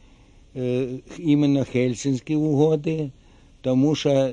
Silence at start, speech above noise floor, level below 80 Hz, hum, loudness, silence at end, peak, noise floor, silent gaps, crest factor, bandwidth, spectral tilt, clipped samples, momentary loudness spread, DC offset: 0.55 s; 30 dB; -52 dBFS; none; -22 LUFS; 0 s; -6 dBFS; -51 dBFS; none; 16 dB; 9.6 kHz; -7 dB/octave; under 0.1%; 11 LU; under 0.1%